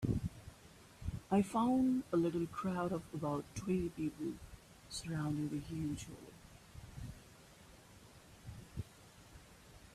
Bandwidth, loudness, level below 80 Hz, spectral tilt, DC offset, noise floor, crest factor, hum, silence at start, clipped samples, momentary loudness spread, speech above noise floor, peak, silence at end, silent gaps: 14.5 kHz; -39 LUFS; -58 dBFS; -7 dB/octave; under 0.1%; -60 dBFS; 18 dB; none; 0 s; under 0.1%; 25 LU; 23 dB; -22 dBFS; 0 s; none